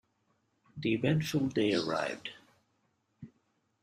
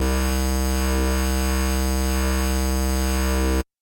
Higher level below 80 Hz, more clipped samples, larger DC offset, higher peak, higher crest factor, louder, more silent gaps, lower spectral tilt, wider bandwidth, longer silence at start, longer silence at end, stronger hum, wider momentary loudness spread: second, -68 dBFS vs -22 dBFS; neither; neither; second, -16 dBFS vs -12 dBFS; first, 20 dB vs 8 dB; second, -32 LUFS vs -23 LUFS; neither; about the same, -6 dB/octave vs -5 dB/octave; second, 14 kHz vs 17 kHz; first, 0.75 s vs 0 s; first, 0.55 s vs 0.2 s; neither; first, 14 LU vs 1 LU